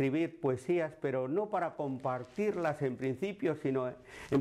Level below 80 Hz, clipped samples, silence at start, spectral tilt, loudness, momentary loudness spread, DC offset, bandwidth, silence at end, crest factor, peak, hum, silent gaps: -70 dBFS; under 0.1%; 0 s; -7.5 dB/octave; -34 LUFS; 4 LU; under 0.1%; 12.5 kHz; 0 s; 12 dB; -22 dBFS; none; none